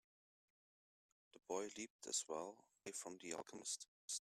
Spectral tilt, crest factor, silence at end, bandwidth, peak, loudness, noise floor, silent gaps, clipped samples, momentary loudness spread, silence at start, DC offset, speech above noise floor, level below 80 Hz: -1 dB/octave; 22 dB; 0 s; 15.5 kHz; -28 dBFS; -48 LUFS; under -90 dBFS; 1.90-1.99 s, 3.88-4.08 s; under 0.1%; 9 LU; 1.35 s; under 0.1%; over 40 dB; under -90 dBFS